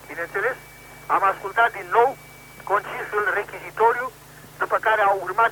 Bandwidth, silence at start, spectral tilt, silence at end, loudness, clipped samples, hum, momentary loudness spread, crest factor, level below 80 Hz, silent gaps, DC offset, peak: 19.5 kHz; 0 s; -3.5 dB/octave; 0 s; -22 LUFS; under 0.1%; none; 17 LU; 18 dB; -58 dBFS; none; under 0.1%; -4 dBFS